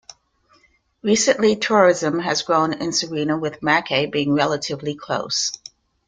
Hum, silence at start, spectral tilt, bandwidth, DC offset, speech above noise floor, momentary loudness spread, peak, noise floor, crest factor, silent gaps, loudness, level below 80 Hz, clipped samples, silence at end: none; 1.05 s; -3.5 dB/octave; 9.6 kHz; under 0.1%; 40 dB; 10 LU; -2 dBFS; -59 dBFS; 18 dB; none; -20 LUFS; -60 dBFS; under 0.1%; 0.5 s